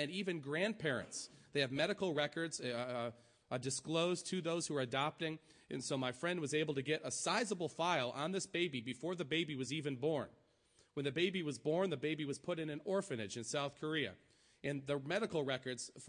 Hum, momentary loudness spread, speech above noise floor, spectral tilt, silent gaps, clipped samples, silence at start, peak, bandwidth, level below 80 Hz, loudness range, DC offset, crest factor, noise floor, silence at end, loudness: none; 7 LU; 33 dB; -4 dB/octave; none; under 0.1%; 0 s; -22 dBFS; 10.5 kHz; -80 dBFS; 2 LU; under 0.1%; 18 dB; -73 dBFS; 0 s; -39 LUFS